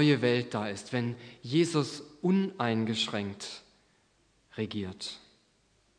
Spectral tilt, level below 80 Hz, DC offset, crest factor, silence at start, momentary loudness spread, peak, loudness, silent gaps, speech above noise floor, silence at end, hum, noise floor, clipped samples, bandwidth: -5.5 dB/octave; -74 dBFS; under 0.1%; 20 dB; 0 s; 15 LU; -12 dBFS; -31 LUFS; none; 39 dB; 0.8 s; none; -69 dBFS; under 0.1%; 10.5 kHz